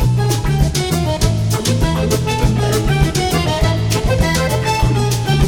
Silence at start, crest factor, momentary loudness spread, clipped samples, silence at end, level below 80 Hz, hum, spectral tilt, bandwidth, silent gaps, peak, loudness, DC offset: 0 s; 14 dB; 1 LU; under 0.1%; 0 s; -22 dBFS; none; -5 dB/octave; 18.5 kHz; none; 0 dBFS; -16 LUFS; 0.2%